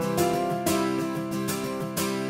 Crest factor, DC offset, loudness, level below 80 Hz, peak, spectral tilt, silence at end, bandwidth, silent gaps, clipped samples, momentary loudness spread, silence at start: 16 dB; under 0.1%; -27 LUFS; -58 dBFS; -10 dBFS; -4.5 dB/octave; 0 s; 16.5 kHz; none; under 0.1%; 5 LU; 0 s